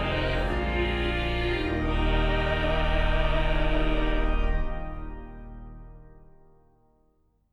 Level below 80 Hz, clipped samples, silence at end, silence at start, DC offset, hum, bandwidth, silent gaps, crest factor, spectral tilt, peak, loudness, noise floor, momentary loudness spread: -28 dBFS; under 0.1%; 1.3 s; 0 s; under 0.1%; none; 6.2 kHz; none; 14 dB; -7 dB/octave; -12 dBFS; -27 LUFS; -66 dBFS; 18 LU